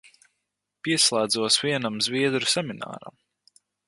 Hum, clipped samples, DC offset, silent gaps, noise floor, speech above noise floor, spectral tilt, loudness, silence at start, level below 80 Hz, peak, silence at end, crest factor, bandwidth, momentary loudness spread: 50 Hz at -60 dBFS; under 0.1%; under 0.1%; none; -81 dBFS; 56 dB; -2.5 dB/octave; -23 LUFS; 0.85 s; -70 dBFS; -6 dBFS; 0.75 s; 22 dB; 12 kHz; 16 LU